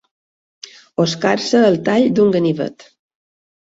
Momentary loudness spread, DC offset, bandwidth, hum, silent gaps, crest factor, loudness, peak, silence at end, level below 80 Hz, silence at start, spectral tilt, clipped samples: 13 LU; under 0.1%; 8 kHz; none; none; 16 dB; -16 LUFS; -2 dBFS; 1 s; -58 dBFS; 1 s; -5.5 dB/octave; under 0.1%